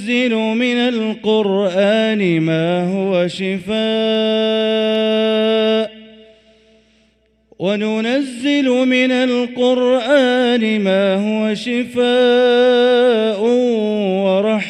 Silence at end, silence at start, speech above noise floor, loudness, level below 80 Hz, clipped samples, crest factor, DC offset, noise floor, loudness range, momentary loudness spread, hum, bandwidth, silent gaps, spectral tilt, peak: 0 s; 0 s; 43 dB; -15 LUFS; -60 dBFS; under 0.1%; 14 dB; under 0.1%; -58 dBFS; 5 LU; 6 LU; none; 11 kHz; none; -6 dB/octave; -2 dBFS